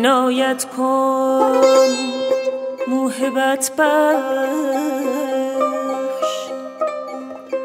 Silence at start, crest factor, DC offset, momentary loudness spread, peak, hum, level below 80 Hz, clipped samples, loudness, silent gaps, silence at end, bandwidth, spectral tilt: 0 s; 18 dB; under 0.1%; 10 LU; 0 dBFS; none; -76 dBFS; under 0.1%; -18 LUFS; none; 0 s; 16 kHz; -2 dB/octave